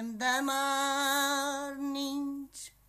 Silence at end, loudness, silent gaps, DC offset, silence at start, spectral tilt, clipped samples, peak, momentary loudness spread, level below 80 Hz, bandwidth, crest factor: 0.2 s; -31 LUFS; none; under 0.1%; 0 s; -1 dB/octave; under 0.1%; -16 dBFS; 10 LU; -70 dBFS; 15 kHz; 16 dB